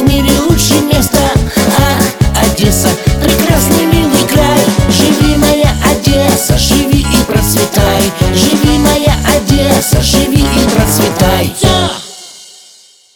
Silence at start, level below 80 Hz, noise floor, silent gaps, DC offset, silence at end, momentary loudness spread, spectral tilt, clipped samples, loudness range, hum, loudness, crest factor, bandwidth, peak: 0 s; -18 dBFS; -41 dBFS; none; under 0.1%; 0.7 s; 2 LU; -4.5 dB/octave; 0.8%; 1 LU; none; -9 LUFS; 10 dB; over 20 kHz; 0 dBFS